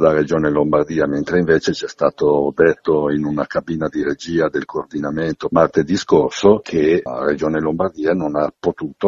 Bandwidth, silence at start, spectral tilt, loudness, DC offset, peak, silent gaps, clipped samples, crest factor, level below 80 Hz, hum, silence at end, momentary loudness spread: 7.8 kHz; 0 s; -6.5 dB/octave; -18 LUFS; under 0.1%; 0 dBFS; none; under 0.1%; 16 dB; -46 dBFS; none; 0 s; 7 LU